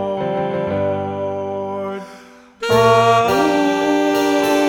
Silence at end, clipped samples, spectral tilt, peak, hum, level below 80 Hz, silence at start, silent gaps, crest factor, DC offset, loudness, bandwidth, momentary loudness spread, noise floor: 0 s; under 0.1%; -5 dB/octave; -2 dBFS; none; -52 dBFS; 0 s; none; 16 dB; under 0.1%; -17 LUFS; 18 kHz; 13 LU; -42 dBFS